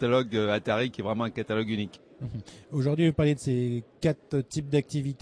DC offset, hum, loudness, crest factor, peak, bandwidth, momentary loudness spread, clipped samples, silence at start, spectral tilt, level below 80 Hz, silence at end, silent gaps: under 0.1%; none; -28 LUFS; 16 dB; -12 dBFS; 11 kHz; 14 LU; under 0.1%; 0 s; -6.5 dB/octave; -54 dBFS; 0.05 s; none